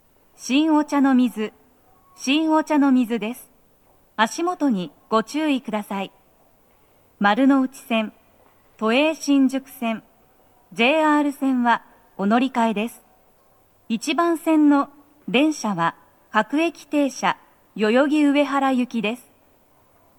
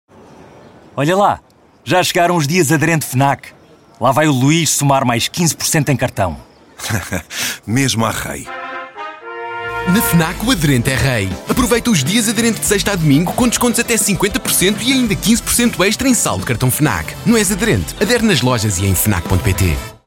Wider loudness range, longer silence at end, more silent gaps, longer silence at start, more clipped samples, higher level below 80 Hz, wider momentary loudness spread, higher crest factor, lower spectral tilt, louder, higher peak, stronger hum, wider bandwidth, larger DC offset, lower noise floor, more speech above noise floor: about the same, 3 LU vs 4 LU; first, 1 s vs 0.1 s; neither; about the same, 0.4 s vs 0.4 s; neither; second, -68 dBFS vs -34 dBFS; about the same, 12 LU vs 10 LU; first, 20 dB vs 14 dB; about the same, -4.5 dB/octave vs -4 dB/octave; second, -21 LUFS vs -14 LUFS; about the same, -2 dBFS vs 0 dBFS; neither; first, 19 kHz vs 17 kHz; neither; first, -58 dBFS vs -41 dBFS; first, 38 dB vs 26 dB